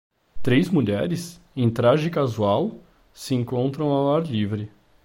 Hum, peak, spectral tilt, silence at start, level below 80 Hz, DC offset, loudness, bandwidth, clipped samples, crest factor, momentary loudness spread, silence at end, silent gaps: none; -8 dBFS; -7 dB/octave; 0.35 s; -52 dBFS; under 0.1%; -23 LUFS; 16.5 kHz; under 0.1%; 16 dB; 11 LU; 0.35 s; none